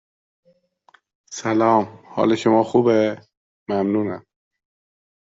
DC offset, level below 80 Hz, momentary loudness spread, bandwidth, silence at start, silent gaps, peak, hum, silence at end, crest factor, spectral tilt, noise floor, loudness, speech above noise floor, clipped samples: under 0.1%; -64 dBFS; 19 LU; 7.8 kHz; 1.3 s; 3.37-3.66 s; -4 dBFS; none; 1.1 s; 18 dB; -6 dB/octave; -59 dBFS; -20 LUFS; 41 dB; under 0.1%